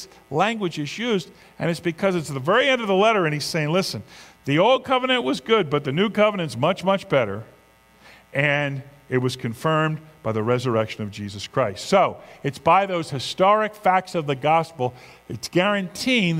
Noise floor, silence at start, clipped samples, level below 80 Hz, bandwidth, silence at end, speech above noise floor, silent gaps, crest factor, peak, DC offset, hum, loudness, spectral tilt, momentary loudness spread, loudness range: -54 dBFS; 0 s; under 0.1%; -60 dBFS; 16 kHz; 0 s; 32 dB; none; 18 dB; -4 dBFS; under 0.1%; none; -22 LUFS; -5.5 dB/octave; 10 LU; 4 LU